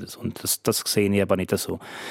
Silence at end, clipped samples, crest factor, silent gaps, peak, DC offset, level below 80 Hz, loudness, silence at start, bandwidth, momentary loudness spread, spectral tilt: 0 s; under 0.1%; 20 dB; none; -6 dBFS; under 0.1%; -60 dBFS; -24 LUFS; 0 s; 16.5 kHz; 10 LU; -4 dB/octave